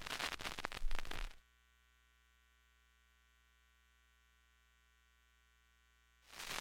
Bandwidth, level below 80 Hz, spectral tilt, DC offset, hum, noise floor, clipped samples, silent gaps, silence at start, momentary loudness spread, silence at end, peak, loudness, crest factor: 17 kHz; -52 dBFS; -2 dB/octave; under 0.1%; 60 Hz at -75 dBFS; -73 dBFS; under 0.1%; none; 0 s; 11 LU; 0 s; -20 dBFS; -46 LUFS; 26 dB